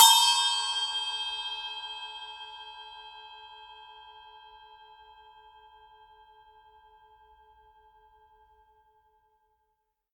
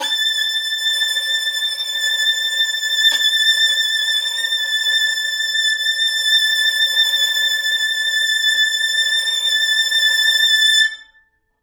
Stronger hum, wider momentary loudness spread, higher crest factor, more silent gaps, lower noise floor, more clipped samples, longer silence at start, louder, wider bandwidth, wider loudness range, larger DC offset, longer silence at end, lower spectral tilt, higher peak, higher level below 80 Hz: neither; first, 27 LU vs 5 LU; first, 28 dB vs 14 dB; neither; first, -79 dBFS vs -58 dBFS; neither; about the same, 0 s vs 0 s; second, -26 LUFS vs -15 LUFS; second, 17.5 kHz vs over 20 kHz; first, 26 LU vs 1 LU; neither; first, 5.95 s vs 0.6 s; about the same, 5.5 dB/octave vs 6 dB/octave; about the same, -4 dBFS vs -4 dBFS; about the same, -72 dBFS vs -72 dBFS